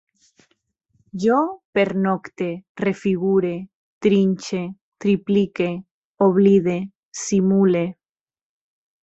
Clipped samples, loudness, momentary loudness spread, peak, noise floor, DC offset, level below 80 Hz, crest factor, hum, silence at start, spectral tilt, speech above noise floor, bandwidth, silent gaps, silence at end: under 0.1%; -20 LUFS; 12 LU; -4 dBFS; -69 dBFS; under 0.1%; -60 dBFS; 18 dB; none; 1.15 s; -6.5 dB/octave; 49 dB; 8.2 kHz; 1.65-1.73 s, 2.69-2.75 s, 3.75-4.01 s, 4.81-4.92 s, 5.91-6.15 s, 6.95-7.12 s; 1.1 s